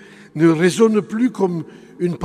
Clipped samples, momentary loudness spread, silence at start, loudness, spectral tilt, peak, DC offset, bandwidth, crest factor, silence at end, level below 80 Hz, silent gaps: under 0.1%; 15 LU; 0.35 s; -17 LUFS; -6.5 dB/octave; -2 dBFS; under 0.1%; 13.5 kHz; 16 dB; 0 s; -64 dBFS; none